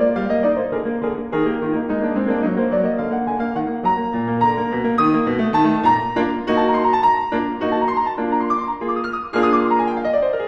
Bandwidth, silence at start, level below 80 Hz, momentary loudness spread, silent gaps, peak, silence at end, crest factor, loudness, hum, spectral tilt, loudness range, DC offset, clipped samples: 6.8 kHz; 0 s; -48 dBFS; 6 LU; none; -4 dBFS; 0 s; 16 dB; -19 LUFS; none; -8 dB/octave; 3 LU; under 0.1%; under 0.1%